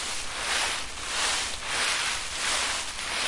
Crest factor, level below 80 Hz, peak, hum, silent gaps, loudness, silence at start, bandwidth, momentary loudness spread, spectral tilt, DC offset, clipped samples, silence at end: 16 dB; -50 dBFS; -14 dBFS; none; none; -27 LUFS; 0 s; 11.5 kHz; 5 LU; 0.5 dB/octave; under 0.1%; under 0.1%; 0 s